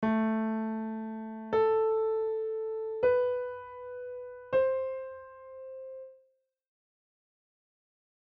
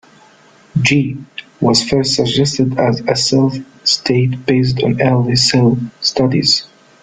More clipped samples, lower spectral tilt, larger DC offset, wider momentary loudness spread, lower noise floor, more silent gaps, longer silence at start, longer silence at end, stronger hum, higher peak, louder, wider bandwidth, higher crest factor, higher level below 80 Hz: neither; first, -6 dB/octave vs -4.5 dB/octave; neither; first, 18 LU vs 6 LU; first, -71 dBFS vs -46 dBFS; neither; second, 0 s vs 0.75 s; first, 2.1 s vs 0.4 s; neither; second, -16 dBFS vs 0 dBFS; second, -31 LUFS vs -14 LUFS; second, 5.2 kHz vs 9.6 kHz; about the same, 16 dB vs 14 dB; second, -68 dBFS vs -46 dBFS